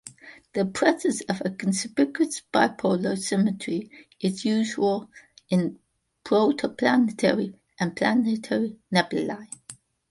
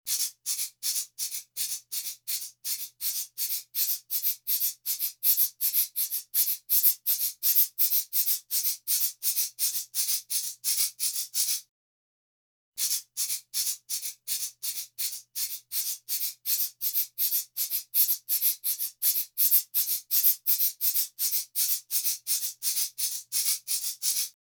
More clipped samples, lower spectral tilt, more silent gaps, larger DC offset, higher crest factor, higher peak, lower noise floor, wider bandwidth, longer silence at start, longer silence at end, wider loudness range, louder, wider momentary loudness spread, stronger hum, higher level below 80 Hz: neither; first, -5 dB/octave vs 5 dB/octave; second, none vs 11.69-12.72 s; neither; about the same, 20 dB vs 22 dB; about the same, -4 dBFS vs -6 dBFS; second, -49 dBFS vs under -90 dBFS; second, 11.5 kHz vs over 20 kHz; about the same, 0.05 s vs 0.05 s; about the same, 0.35 s vs 0.25 s; second, 2 LU vs 7 LU; about the same, -25 LUFS vs -26 LUFS; about the same, 10 LU vs 10 LU; neither; first, -66 dBFS vs -86 dBFS